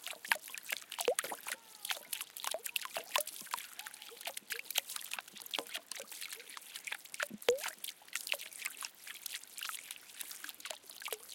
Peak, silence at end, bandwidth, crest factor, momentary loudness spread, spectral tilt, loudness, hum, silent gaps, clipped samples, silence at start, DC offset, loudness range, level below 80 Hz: -10 dBFS; 0 s; 17 kHz; 32 dB; 10 LU; 1 dB/octave; -40 LUFS; none; none; under 0.1%; 0 s; under 0.1%; 3 LU; -90 dBFS